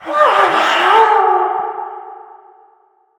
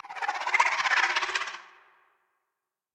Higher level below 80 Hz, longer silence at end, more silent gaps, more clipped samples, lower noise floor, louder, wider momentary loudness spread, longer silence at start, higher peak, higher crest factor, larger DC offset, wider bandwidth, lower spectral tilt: first, -66 dBFS vs -76 dBFS; second, 0.95 s vs 1.3 s; neither; neither; second, -54 dBFS vs -85 dBFS; first, -12 LUFS vs -26 LUFS; first, 17 LU vs 11 LU; about the same, 0 s vs 0.05 s; first, 0 dBFS vs -8 dBFS; second, 14 dB vs 22 dB; neither; about the same, 17 kHz vs 17.5 kHz; first, -2 dB/octave vs 1.5 dB/octave